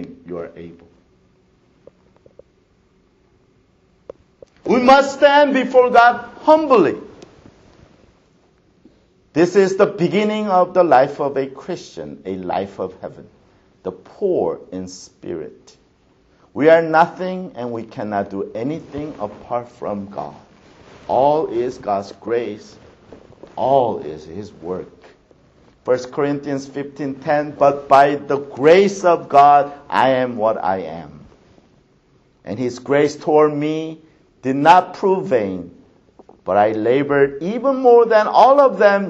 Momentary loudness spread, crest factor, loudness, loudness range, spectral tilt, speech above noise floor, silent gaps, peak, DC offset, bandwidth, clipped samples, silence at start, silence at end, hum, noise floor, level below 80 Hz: 19 LU; 18 dB; -16 LUFS; 11 LU; -6 dB/octave; 41 dB; none; 0 dBFS; under 0.1%; 8.2 kHz; under 0.1%; 0 s; 0 s; none; -57 dBFS; -58 dBFS